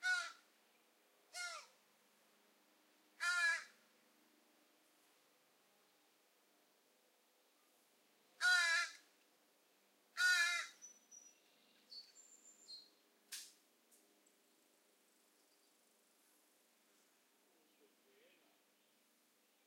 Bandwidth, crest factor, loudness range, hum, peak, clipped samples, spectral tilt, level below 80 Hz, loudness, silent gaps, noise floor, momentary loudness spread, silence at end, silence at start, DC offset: 16 kHz; 26 dB; 20 LU; none; -22 dBFS; under 0.1%; 4 dB/octave; under -90 dBFS; -38 LUFS; none; -77 dBFS; 23 LU; 6.2 s; 0 s; under 0.1%